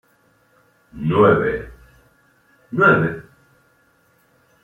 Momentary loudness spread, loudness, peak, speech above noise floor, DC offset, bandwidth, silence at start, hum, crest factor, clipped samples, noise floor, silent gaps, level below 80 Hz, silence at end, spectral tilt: 17 LU; -17 LUFS; -2 dBFS; 43 dB; under 0.1%; 6.6 kHz; 0.95 s; none; 20 dB; under 0.1%; -59 dBFS; none; -50 dBFS; 1.45 s; -9 dB/octave